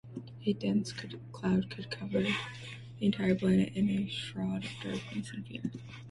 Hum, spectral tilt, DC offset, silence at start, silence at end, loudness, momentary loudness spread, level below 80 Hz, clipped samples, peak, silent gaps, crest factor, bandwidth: none; -6.5 dB/octave; under 0.1%; 0.05 s; 0 s; -33 LUFS; 14 LU; -62 dBFS; under 0.1%; -16 dBFS; none; 18 dB; 11.5 kHz